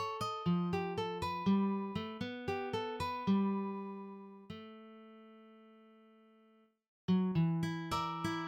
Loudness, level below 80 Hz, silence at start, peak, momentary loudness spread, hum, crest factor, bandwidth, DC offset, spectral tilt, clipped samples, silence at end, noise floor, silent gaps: -36 LUFS; -66 dBFS; 0 s; -22 dBFS; 18 LU; none; 16 dB; 14.5 kHz; under 0.1%; -7 dB/octave; under 0.1%; 0 s; -68 dBFS; 6.88-7.08 s